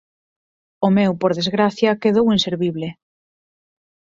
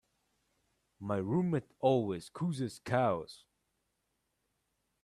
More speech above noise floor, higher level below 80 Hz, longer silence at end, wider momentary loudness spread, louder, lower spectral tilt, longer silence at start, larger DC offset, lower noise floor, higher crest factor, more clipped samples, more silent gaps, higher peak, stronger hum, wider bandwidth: first, over 73 dB vs 49 dB; first, -56 dBFS vs -72 dBFS; second, 1.25 s vs 1.7 s; about the same, 7 LU vs 9 LU; first, -18 LUFS vs -34 LUFS; second, -6 dB/octave vs -7.5 dB/octave; second, 0.8 s vs 1 s; neither; first, under -90 dBFS vs -82 dBFS; about the same, 18 dB vs 22 dB; neither; neither; first, -2 dBFS vs -14 dBFS; neither; second, 7.6 kHz vs 13 kHz